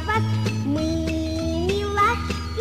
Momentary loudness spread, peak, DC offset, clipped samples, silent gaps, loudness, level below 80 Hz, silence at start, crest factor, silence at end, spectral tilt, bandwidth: 5 LU; -10 dBFS; 0.5%; under 0.1%; none; -23 LUFS; -34 dBFS; 0 s; 14 dB; 0 s; -6 dB/octave; 15 kHz